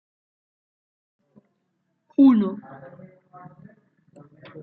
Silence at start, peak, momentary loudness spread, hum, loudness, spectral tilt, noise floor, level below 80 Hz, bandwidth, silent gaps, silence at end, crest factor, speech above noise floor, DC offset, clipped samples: 2.2 s; -6 dBFS; 27 LU; none; -19 LUFS; -10 dB/octave; -74 dBFS; -76 dBFS; 4.2 kHz; none; 0 s; 20 dB; 54 dB; under 0.1%; under 0.1%